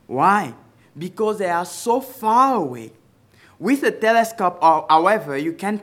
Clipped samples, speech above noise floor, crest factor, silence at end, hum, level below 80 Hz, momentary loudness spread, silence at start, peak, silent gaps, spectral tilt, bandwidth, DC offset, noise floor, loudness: under 0.1%; 34 dB; 18 dB; 0 s; none; -72 dBFS; 12 LU; 0.1 s; -2 dBFS; none; -5 dB/octave; 17 kHz; under 0.1%; -53 dBFS; -19 LUFS